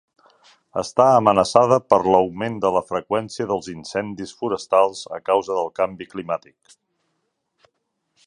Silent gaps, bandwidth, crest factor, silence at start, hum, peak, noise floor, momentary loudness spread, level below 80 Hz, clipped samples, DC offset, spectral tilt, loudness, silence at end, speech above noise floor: none; 11 kHz; 20 dB; 0.75 s; none; 0 dBFS; -73 dBFS; 13 LU; -58 dBFS; under 0.1%; under 0.1%; -5.5 dB/octave; -20 LUFS; 1.9 s; 54 dB